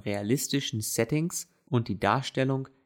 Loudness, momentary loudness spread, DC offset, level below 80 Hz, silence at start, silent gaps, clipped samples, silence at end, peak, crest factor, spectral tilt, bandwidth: -29 LUFS; 4 LU; under 0.1%; -64 dBFS; 0.05 s; none; under 0.1%; 0.2 s; -10 dBFS; 18 dB; -4.5 dB/octave; 19 kHz